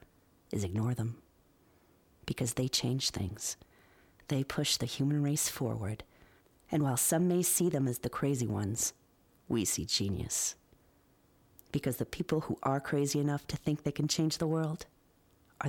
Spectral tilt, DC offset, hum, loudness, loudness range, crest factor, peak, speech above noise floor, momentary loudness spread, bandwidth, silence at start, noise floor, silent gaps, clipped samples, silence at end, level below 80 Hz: -4.5 dB/octave; under 0.1%; none; -33 LUFS; 4 LU; 18 dB; -16 dBFS; 34 dB; 11 LU; 19.5 kHz; 0.5 s; -67 dBFS; none; under 0.1%; 0 s; -60 dBFS